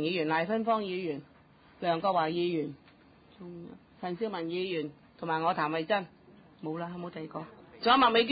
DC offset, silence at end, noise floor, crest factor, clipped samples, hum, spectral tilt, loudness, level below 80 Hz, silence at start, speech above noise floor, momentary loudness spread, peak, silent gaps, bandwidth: under 0.1%; 0 s; -59 dBFS; 18 dB; under 0.1%; none; -9 dB/octave; -31 LUFS; -68 dBFS; 0 s; 28 dB; 19 LU; -12 dBFS; none; 5 kHz